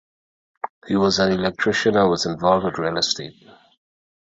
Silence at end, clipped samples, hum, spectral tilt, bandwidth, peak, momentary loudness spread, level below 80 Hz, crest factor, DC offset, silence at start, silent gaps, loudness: 1 s; under 0.1%; none; -4.5 dB/octave; 8 kHz; -2 dBFS; 17 LU; -52 dBFS; 20 dB; under 0.1%; 0.65 s; 0.70-0.82 s; -20 LUFS